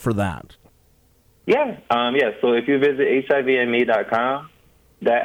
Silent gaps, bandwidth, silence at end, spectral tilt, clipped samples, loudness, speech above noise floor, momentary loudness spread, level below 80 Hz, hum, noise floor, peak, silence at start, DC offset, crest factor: none; 16 kHz; 0 s; -6.5 dB/octave; under 0.1%; -20 LUFS; 38 dB; 8 LU; -54 dBFS; none; -58 dBFS; -6 dBFS; 0 s; under 0.1%; 16 dB